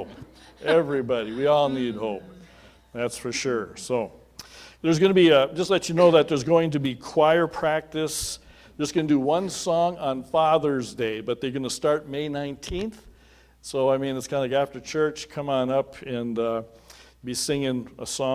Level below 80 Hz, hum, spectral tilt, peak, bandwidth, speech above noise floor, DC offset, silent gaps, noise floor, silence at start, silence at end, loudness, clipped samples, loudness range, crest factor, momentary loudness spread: -54 dBFS; none; -5 dB/octave; -4 dBFS; 16 kHz; 31 dB; under 0.1%; none; -55 dBFS; 0 s; 0 s; -24 LUFS; under 0.1%; 7 LU; 20 dB; 13 LU